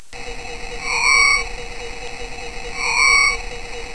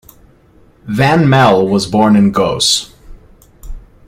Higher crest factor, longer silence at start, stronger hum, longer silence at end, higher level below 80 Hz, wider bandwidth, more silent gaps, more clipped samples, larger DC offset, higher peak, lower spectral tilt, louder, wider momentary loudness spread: first, 18 dB vs 12 dB; second, 0.1 s vs 0.85 s; neither; second, 0 s vs 0.3 s; about the same, -34 dBFS vs -36 dBFS; second, 11 kHz vs 16 kHz; neither; neither; first, 2% vs under 0.1%; about the same, -2 dBFS vs 0 dBFS; second, 0 dB/octave vs -5 dB/octave; second, -15 LUFS vs -11 LUFS; first, 19 LU vs 6 LU